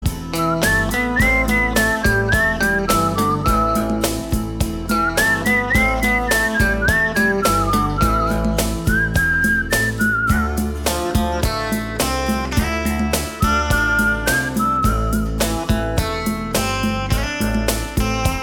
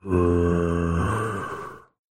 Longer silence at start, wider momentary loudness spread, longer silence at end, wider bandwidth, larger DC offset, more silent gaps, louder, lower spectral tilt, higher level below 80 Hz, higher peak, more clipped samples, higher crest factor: about the same, 0 s vs 0.05 s; second, 5 LU vs 14 LU; second, 0 s vs 0.35 s; first, 18 kHz vs 12 kHz; neither; neither; first, -18 LUFS vs -24 LUFS; second, -4.5 dB/octave vs -8 dB/octave; first, -26 dBFS vs -38 dBFS; first, -2 dBFS vs -8 dBFS; neither; about the same, 16 dB vs 16 dB